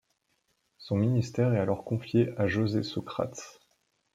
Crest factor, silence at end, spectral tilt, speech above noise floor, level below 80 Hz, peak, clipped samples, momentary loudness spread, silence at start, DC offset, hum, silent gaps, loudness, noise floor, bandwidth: 18 dB; 0.65 s; -7 dB/octave; 47 dB; -64 dBFS; -12 dBFS; under 0.1%; 8 LU; 0.8 s; under 0.1%; none; none; -29 LUFS; -75 dBFS; 7.8 kHz